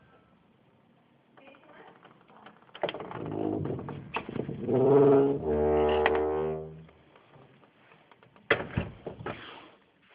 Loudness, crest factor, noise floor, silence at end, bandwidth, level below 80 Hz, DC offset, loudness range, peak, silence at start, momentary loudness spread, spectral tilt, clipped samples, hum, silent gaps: -28 LUFS; 26 dB; -64 dBFS; 0.45 s; 4.9 kHz; -52 dBFS; under 0.1%; 13 LU; -6 dBFS; 1.8 s; 19 LU; -5.5 dB/octave; under 0.1%; none; none